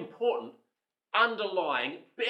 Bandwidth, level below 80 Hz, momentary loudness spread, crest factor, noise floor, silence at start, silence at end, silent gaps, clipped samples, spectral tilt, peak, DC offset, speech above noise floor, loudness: 7.8 kHz; under -90 dBFS; 10 LU; 20 dB; -83 dBFS; 0 s; 0 s; none; under 0.1%; -4.5 dB/octave; -12 dBFS; under 0.1%; 53 dB; -30 LUFS